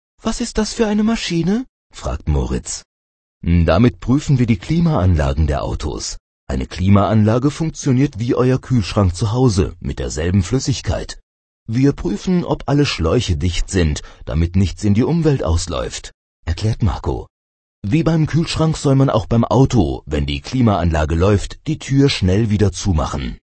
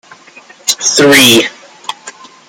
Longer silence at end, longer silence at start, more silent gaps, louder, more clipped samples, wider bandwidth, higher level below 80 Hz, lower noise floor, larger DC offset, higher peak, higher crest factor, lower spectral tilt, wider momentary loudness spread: second, 0.25 s vs 0.4 s; second, 0.25 s vs 0.65 s; first, 1.69-1.90 s, 2.85-3.41 s, 6.20-6.47 s, 11.23-11.66 s, 16.14-16.43 s, 17.30-17.82 s vs none; second, -17 LUFS vs -7 LUFS; second, under 0.1% vs 0.2%; second, 8.8 kHz vs over 20 kHz; first, -28 dBFS vs -52 dBFS; first, under -90 dBFS vs -38 dBFS; neither; about the same, 0 dBFS vs 0 dBFS; about the same, 16 dB vs 12 dB; first, -6.5 dB/octave vs -2 dB/octave; second, 11 LU vs 21 LU